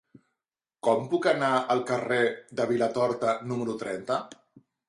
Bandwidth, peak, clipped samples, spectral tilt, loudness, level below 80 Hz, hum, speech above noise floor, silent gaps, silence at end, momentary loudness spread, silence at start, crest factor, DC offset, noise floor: 11.5 kHz; -10 dBFS; under 0.1%; -5.5 dB/octave; -27 LUFS; -70 dBFS; none; 62 dB; none; 0.55 s; 7 LU; 0.85 s; 18 dB; under 0.1%; -88 dBFS